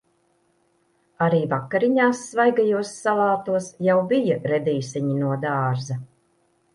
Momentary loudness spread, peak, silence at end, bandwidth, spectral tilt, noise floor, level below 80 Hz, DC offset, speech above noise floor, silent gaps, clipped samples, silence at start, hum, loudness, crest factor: 6 LU; -6 dBFS; 0.7 s; 11.5 kHz; -6.5 dB/octave; -65 dBFS; -66 dBFS; under 0.1%; 44 dB; none; under 0.1%; 1.2 s; none; -22 LUFS; 16 dB